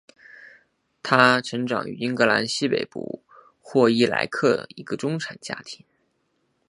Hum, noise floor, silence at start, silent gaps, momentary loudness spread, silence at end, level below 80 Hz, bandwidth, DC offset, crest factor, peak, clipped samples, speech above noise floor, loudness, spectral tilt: none; -71 dBFS; 0.4 s; none; 17 LU; 0.95 s; -68 dBFS; 11.5 kHz; under 0.1%; 24 dB; 0 dBFS; under 0.1%; 48 dB; -22 LUFS; -4.5 dB/octave